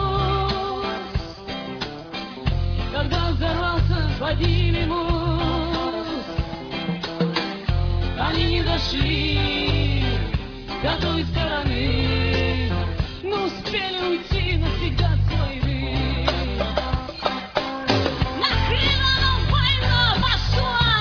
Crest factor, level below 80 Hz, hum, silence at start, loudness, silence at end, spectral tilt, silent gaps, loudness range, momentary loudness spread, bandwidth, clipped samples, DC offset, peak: 18 dB; -28 dBFS; none; 0 s; -22 LUFS; 0 s; -6.5 dB/octave; none; 5 LU; 9 LU; 5.4 kHz; under 0.1%; under 0.1%; -4 dBFS